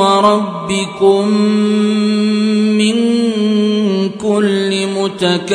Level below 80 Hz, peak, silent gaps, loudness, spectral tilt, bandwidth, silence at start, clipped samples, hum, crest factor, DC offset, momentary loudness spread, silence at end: -56 dBFS; 0 dBFS; none; -13 LUFS; -5.5 dB/octave; 10.5 kHz; 0 s; under 0.1%; none; 12 dB; under 0.1%; 5 LU; 0 s